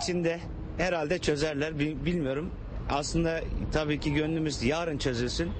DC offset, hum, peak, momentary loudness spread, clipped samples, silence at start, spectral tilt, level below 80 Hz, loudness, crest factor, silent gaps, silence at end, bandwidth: under 0.1%; none; -14 dBFS; 5 LU; under 0.1%; 0 s; -5.5 dB/octave; -40 dBFS; -30 LUFS; 16 dB; none; 0 s; 8.8 kHz